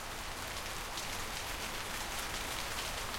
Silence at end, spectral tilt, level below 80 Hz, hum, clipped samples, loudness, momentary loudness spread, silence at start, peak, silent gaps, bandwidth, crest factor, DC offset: 0 s; -1.5 dB/octave; -50 dBFS; none; under 0.1%; -39 LUFS; 3 LU; 0 s; -20 dBFS; none; 17 kHz; 20 dB; under 0.1%